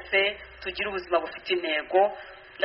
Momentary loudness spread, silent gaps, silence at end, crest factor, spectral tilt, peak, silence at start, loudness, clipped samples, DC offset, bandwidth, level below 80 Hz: 12 LU; none; 0 s; 18 dB; 0 dB/octave; -8 dBFS; 0 s; -27 LUFS; under 0.1%; under 0.1%; 5.8 kHz; -58 dBFS